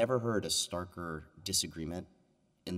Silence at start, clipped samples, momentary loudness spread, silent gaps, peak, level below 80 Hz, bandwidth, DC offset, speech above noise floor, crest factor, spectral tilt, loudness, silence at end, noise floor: 0 s; under 0.1%; 11 LU; none; -16 dBFS; -60 dBFS; 16 kHz; under 0.1%; 36 dB; 20 dB; -3.5 dB/octave; -35 LUFS; 0 s; -71 dBFS